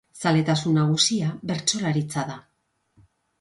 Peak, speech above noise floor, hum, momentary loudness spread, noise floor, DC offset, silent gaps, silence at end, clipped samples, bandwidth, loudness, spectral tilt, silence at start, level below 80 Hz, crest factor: -4 dBFS; 41 dB; none; 10 LU; -64 dBFS; under 0.1%; none; 1 s; under 0.1%; 11.5 kHz; -23 LUFS; -4.5 dB/octave; 0.15 s; -62 dBFS; 20 dB